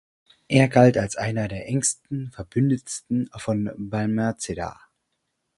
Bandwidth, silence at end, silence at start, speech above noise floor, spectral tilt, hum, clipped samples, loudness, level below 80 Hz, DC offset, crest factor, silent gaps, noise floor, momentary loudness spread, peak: 11.5 kHz; 0.85 s; 0.5 s; 54 dB; -5.5 dB/octave; none; under 0.1%; -23 LUFS; -52 dBFS; under 0.1%; 22 dB; none; -76 dBFS; 13 LU; -2 dBFS